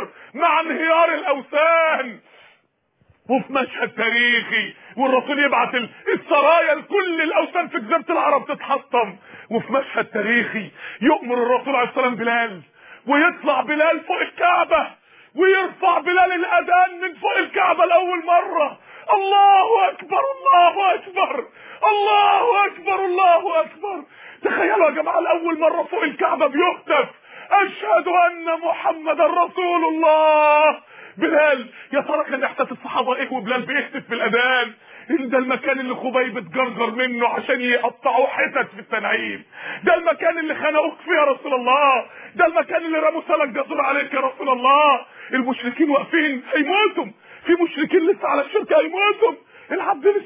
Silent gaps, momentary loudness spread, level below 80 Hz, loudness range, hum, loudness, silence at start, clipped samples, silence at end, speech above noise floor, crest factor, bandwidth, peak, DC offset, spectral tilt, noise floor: none; 9 LU; -68 dBFS; 4 LU; none; -19 LUFS; 0 s; under 0.1%; 0 s; 45 dB; 16 dB; 3.9 kHz; -4 dBFS; under 0.1%; -7.5 dB/octave; -64 dBFS